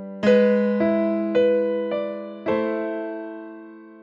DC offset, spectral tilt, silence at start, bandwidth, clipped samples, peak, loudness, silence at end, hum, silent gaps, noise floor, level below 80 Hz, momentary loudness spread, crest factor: under 0.1%; -8 dB/octave; 0 s; 7.2 kHz; under 0.1%; -6 dBFS; -22 LUFS; 0 s; none; none; -42 dBFS; -68 dBFS; 17 LU; 16 dB